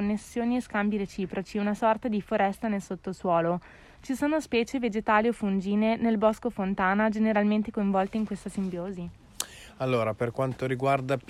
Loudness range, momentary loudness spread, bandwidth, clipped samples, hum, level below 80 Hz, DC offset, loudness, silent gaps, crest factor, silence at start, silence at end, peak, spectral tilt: 4 LU; 10 LU; 13.5 kHz; under 0.1%; none; -56 dBFS; under 0.1%; -28 LUFS; none; 20 dB; 0 s; 0.1 s; -8 dBFS; -6 dB/octave